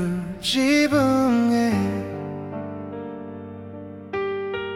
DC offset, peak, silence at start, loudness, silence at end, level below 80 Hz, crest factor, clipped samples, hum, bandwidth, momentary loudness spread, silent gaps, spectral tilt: under 0.1%; -8 dBFS; 0 s; -22 LUFS; 0 s; -52 dBFS; 16 dB; under 0.1%; none; 16 kHz; 18 LU; none; -5 dB/octave